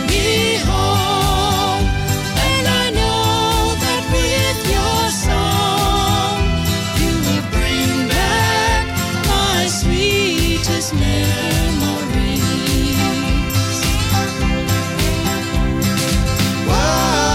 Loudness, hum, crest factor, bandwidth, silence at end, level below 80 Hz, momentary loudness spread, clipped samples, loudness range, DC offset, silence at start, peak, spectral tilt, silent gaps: -16 LUFS; none; 10 dB; 16.5 kHz; 0 s; -24 dBFS; 3 LU; under 0.1%; 2 LU; under 0.1%; 0 s; -6 dBFS; -4 dB/octave; none